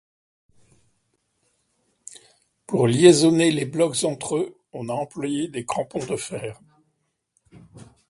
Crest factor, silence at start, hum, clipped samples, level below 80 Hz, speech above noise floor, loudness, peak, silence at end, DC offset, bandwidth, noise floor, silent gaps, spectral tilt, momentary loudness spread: 24 dB; 2.7 s; none; under 0.1%; -62 dBFS; 52 dB; -21 LUFS; 0 dBFS; 0.25 s; under 0.1%; 11.5 kHz; -73 dBFS; none; -5 dB/octave; 20 LU